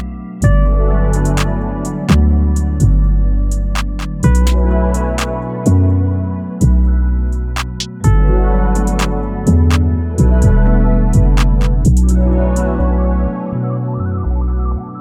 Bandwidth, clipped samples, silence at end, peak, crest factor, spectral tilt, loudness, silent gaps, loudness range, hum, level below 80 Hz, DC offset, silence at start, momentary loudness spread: 12 kHz; under 0.1%; 0 s; 0 dBFS; 12 dB; -7 dB/octave; -15 LUFS; none; 2 LU; none; -14 dBFS; under 0.1%; 0 s; 7 LU